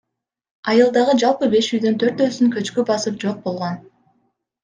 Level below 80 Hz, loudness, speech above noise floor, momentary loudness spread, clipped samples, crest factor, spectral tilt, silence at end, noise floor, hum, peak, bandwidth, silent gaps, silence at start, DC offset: -64 dBFS; -18 LUFS; 50 dB; 11 LU; under 0.1%; 16 dB; -5 dB/octave; 0.85 s; -67 dBFS; none; -2 dBFS; 9.6 kHz; none; 0.65 s; under 0.1%